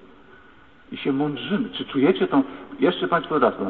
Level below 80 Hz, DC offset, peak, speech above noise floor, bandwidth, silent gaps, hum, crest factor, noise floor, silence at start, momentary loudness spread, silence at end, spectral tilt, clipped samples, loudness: -60 dBFS; 0.2%; -6 dBFS; 29 dB; 4.4 kHz; none; none; 18 dB; -51 dBFS; 0.9 s; 8 LU; 0 s; -9.5 dB/octave; under 0.1%; -23 LUFS